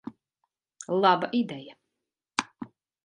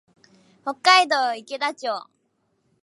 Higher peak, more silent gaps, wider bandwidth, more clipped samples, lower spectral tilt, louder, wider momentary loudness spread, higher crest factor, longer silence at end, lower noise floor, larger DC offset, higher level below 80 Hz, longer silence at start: about the same, -4 dBFS vs -2 dBFS; neither; about the same, 11 kHz vs 11.5 kHz; neither; first, -4.5 dB/octave vs 0 dB/octave; second, -27 LUFS vs -20 LUFS; first, 22 LU vs 17 LU; about the same, 26 dB vs 22 dB; second, 0.4 s vs 0.85 s; first, -86 dBFS vs -70 dBFS; neither; first, -76 dBFS vs -84 dBFS; second, 0.05 s vs 0.65 s